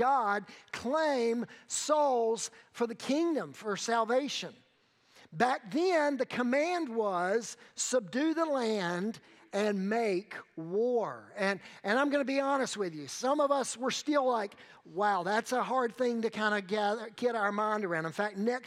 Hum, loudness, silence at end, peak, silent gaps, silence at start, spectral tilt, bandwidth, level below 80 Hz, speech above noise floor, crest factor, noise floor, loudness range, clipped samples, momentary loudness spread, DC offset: none; -32 LUFS; 0 s; -12 dBFS; none; 0 s; -4 dB/octave; 15 kHz; -86 dBFS; 37 dB; 20 dB; -68 dBFS; 2 LU; under 0.1%; 8 LU; under 0.1%